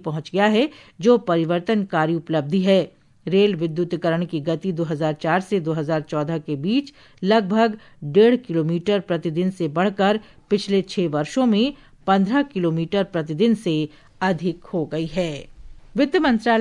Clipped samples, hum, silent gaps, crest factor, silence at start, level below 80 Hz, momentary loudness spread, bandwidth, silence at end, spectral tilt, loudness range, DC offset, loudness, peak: under 0.1%; none; none; 16 dB; 0.05 s; -54 dBFS; 8 LU; 11.5 kHz; 0 s; -7 dB/octave; 3 LU; under 0.1%; -21 LUFS; -4 dBFS